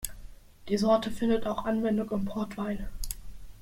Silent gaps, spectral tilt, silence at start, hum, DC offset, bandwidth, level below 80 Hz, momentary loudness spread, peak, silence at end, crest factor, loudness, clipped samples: none; -5.5 dB/octave; 0 s; none; under 0.1%; 16.5 kHz; -44 dBFS; 13 LU; -12 dBFS; 0 s; 18 dB; -30 LUFS; under 0.1%